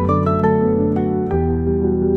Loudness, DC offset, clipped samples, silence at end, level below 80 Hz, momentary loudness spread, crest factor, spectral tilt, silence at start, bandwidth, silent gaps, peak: -18 LUFS; 0.2%; under 0.1%; 0 s; -36 dBFS; 3 LU; 12 dB; -11 dB/octave; 0 s; 4.2 kHz; none; -4 dBFS